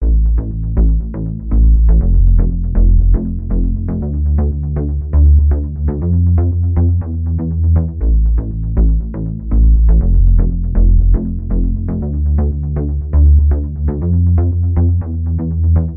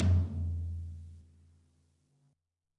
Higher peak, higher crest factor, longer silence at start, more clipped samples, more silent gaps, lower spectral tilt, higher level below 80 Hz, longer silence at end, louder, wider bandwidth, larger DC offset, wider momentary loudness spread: first, -2 dBFS vs -18 dBFS; second, 10 dB vs 16 dB; about the same, 0 s vs 0 s; neither; neither; first, -16 dB/octave vs -9 dB/octave; first, -14 dBFS vs -52 dBFS; second, 0 s vs 1.55 s; first, -15 LUFS vs -35 LUFS; second, 1.9 kHz vs 5.8 kHz; neither; second, 7 LU vs 20 LU